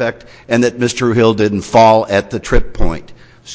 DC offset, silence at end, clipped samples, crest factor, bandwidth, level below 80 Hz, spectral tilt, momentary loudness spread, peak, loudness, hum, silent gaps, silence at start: under 0.1%; 0 s; under 0.1%; 12 dB; 8 kHz; -26 dBFS; -5.5 dB/octave; 13 LU; 0 dBFS; -13 LUFS; none; none; 0 s